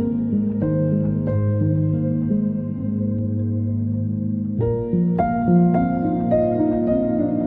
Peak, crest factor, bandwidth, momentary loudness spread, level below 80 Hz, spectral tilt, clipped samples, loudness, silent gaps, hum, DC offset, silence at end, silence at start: -6 dBFS; 14 dB; 3.7 kHz; 6 LU; -42 dBFS; -13.5 dB/octave; under 0.1%; -21 LUFS; none; none; under 0.1%; 0 s; 0 s